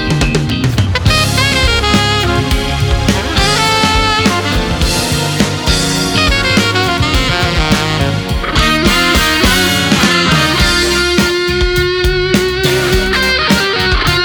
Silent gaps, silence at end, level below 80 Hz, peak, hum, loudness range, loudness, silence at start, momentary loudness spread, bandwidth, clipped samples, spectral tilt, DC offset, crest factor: none; 0 s; -20 dBFS; 0 dBFS; none; 2 LU; -11 LUFS; 0 s; 4 LU; over 20 kHz; under 0.1%; -4 dB/octave; under 0.1%; 12 dB